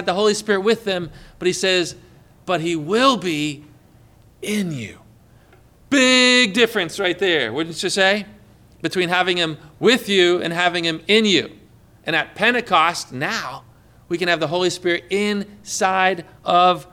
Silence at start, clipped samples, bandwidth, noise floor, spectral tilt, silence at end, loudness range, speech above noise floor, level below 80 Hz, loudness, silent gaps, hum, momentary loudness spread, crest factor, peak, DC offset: 0 s; under 0.1%; 18 kHz; -50 dBFS; -3.5 dB/octave; 0.1 s; 5 LU; 31 dB; -56 dBFS; -18 LUFS; none; none; 12 LU; 16 dB; -4 dBFS; under 0.1%